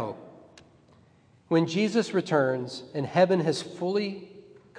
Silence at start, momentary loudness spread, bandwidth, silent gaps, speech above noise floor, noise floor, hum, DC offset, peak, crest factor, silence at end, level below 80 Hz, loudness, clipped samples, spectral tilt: 0 s; 12 LU; 10.5 kHz; none; 34 dB; -60 dBFS; none; under 0.1%; -8 dBFS; 20 dB; 0 s; -74 dBFS; -27 LUFS; under 0.1%; -6 dB/octave